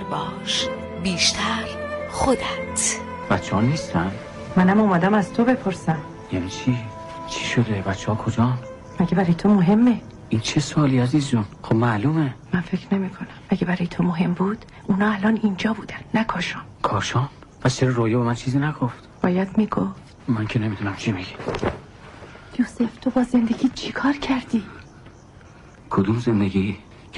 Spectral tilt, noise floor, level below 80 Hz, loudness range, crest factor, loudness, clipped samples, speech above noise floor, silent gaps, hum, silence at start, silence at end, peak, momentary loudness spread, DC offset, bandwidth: -5.5 dB/octave; -45 dBFS; -48 dBFS; 4 LU; 14 dB; -22 LUFS; under 0.1%; 24 dB; none; none; 0 s; 0 s; -8 dBFS; 10 LU; under 0.1%; 11.5 kHz